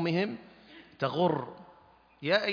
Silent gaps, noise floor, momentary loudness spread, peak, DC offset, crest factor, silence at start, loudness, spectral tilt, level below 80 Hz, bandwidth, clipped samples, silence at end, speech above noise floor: none; -60 dBFS; 24 LU; -12 dBFS; under 0.1%; 20 dB; 0 s; -31 LUFS; -7 dB/octave; -72 dBFS; 5.2 kHz; under 0.1%; 0 s; 30 dB